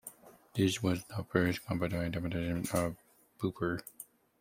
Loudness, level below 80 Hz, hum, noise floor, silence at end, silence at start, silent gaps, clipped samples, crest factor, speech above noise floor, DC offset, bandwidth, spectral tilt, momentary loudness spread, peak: -34 LUFS; -60 dBFS; none; -54 dBFS; 0.4 s; 0.05 s; none; under 0.1%; 24 dB; 21 dB; under 0.1%; 16 kHz; -5.5 dB/octave; 18 LU; -12 dBFS